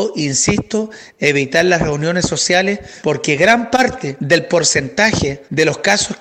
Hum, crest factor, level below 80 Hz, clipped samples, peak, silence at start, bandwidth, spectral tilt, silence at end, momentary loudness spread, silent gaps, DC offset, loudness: none; 16 dB; -42 dBFS; under 0.1%; 0 dBFS; 0 s; 16 kHz; -3.5 dB/octave; 0.05 s; 8 LU; none; under 0.1%; -15 LUFS